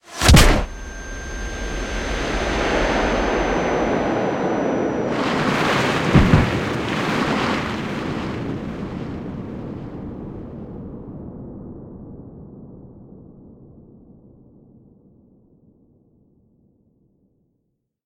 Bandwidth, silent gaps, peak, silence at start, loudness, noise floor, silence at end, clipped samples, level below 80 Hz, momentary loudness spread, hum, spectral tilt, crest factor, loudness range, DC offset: 16.5 kHz; none; 0 dBFS; 0.05 s; -21 LUFS; -73 dBFS; 4.4 s; under 0.1%; -30 dBFS; 20 LU; none; -5 dB/octave; 22 dB; 19 LU; under 0.1%